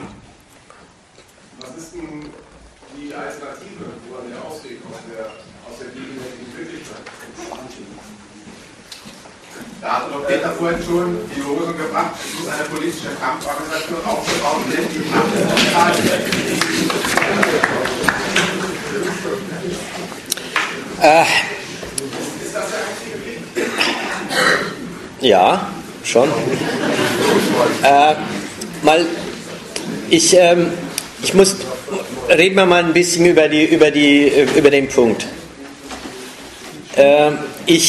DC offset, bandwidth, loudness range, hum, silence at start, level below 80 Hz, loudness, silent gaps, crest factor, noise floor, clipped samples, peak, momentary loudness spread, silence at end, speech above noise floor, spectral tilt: under 0.1%; 13 kHz; 20 LU; none; 0 s; -50 dBFS; -16 LUFS; none; 18 dB; -47 dBFS; under 0.1%; 0 dBFS; 22 LU; 0 s; 32 dB; -3.5 dB/octave